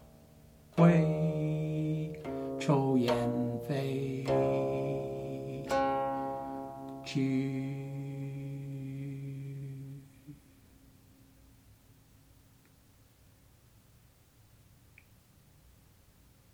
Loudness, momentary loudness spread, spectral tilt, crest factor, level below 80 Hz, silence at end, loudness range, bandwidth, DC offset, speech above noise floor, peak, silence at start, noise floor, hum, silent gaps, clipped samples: -33 LUFS; 15 LU; -8 dB/octave; 22 dB; -62 dBFS; 6.15 s; 16 LU; 15.5 kHz; under 0.1%; 32 dB; -12 dBFS; 0 s; -62 dBFS; none; none; under 0.1%